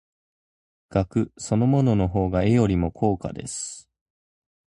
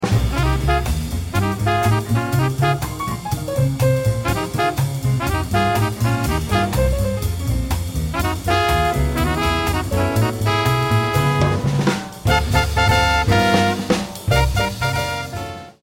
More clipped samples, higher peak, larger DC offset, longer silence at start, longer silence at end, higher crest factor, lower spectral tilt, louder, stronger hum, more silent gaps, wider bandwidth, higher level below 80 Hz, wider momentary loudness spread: neither; second, -6 dBFS vs -2 dBFS; neither; first, 0.9 s vs 0 s; first, 0.85 s vs 0.1 s; about the same, 18 dB vs 16 dB; first, -7 dB/octave vs -5.5 dB/octave; second, -23 LUFS vs -19 LUFS; neither; neither; second, 11.5 kHz vs 16.5 kHz; second, -42 dBFS vs -28 dBFS; first, 11 LU vs 7 LU